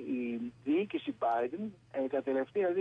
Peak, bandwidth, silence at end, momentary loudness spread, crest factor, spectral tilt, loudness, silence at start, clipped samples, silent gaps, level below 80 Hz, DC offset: -22 dBFS; 6.6 kHz; 0 s; 6 LU; 12 dB; -8 dB/octave; -34 LUFS; 0 s; under 0.1%; none; -76 dBFS; under 0.1%